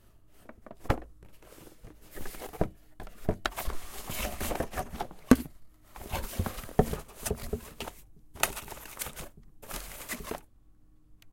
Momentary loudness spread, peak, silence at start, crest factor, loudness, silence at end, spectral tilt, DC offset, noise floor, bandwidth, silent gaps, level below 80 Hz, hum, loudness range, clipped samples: 23 LU; -2 dBFS; 0.15 s; 34 dB; -34 LUFS; 0 s; -4.5 dB/octave; under 0.1%; -57 dBFS; 17 kHz; none; -44 dBFS; none; 6 LU; under 0.1%